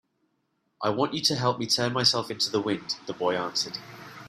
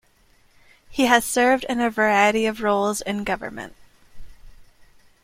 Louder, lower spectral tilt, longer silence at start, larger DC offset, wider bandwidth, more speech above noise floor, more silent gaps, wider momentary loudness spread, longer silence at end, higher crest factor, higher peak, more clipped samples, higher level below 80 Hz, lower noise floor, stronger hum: second, -26 LUFS vs -20 LUFS; about the same, -3.5 dB/octave vs -3.5 dB/octave; about the same, 0.8 s vs 0.9 s; neither; about the same, 15.5 kHz vs 16.5 kHz; first, 47 dB vs 37 dB; neither; second, 10 LU vs 15 LU; second, 0 s vs 0.6 s; about the same, 22 dB vs 22 dB; second, -6 dBFS vs -2 dBFS; neither; second, -68 dBFS vs -50 dBFS; first, -74 dBFS vs -58 dBFS; neither